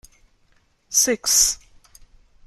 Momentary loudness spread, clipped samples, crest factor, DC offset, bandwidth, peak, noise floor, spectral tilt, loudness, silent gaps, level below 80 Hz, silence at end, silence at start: 7 LU; under 0.1%; 20 dB; under 0.1%; 15.5 kHz; -4 dBFS; -61 dBFS; 0.5 dB/octave; -17 LUFS; none; -50 dBFS; 0.9 s; 0.9 s